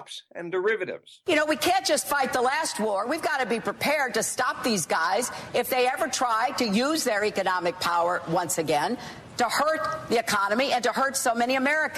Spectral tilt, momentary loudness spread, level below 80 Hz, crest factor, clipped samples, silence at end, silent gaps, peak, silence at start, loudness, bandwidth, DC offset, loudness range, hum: -2.5 dB/octave; 5 LU; -64 dBFS; 12 dB; under 0.1%; 0 s; none; -14 dBFS; 0 s; -25 LUFS; 14.5 kHz; under 0.1%; 1 LU; none